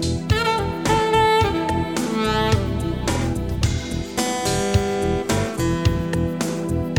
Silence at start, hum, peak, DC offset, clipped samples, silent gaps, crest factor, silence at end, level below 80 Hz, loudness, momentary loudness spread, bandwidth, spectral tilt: 0 s; none; -4 dBFS; 0.2%; under 0.1%; none; 16 dB; 0 s; -32 dBFS; -21 LUFS; 6 LU; 19 kHz; -5 dB/octave